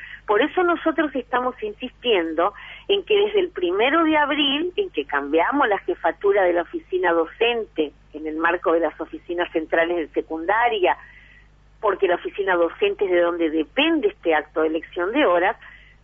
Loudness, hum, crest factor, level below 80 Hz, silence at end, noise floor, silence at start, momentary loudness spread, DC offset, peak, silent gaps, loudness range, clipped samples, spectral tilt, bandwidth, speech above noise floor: -21 LUFS; 50 Hz at -55 dBFS; 16 dB; -52 dBFS; 0.25 s; -51 dBFS; 0 s; 8 LU; under 0.1%; -6 dBFS; none; 3 LU; under 0.1%; -6 dB/octave; 3.7 kHz; 30 dB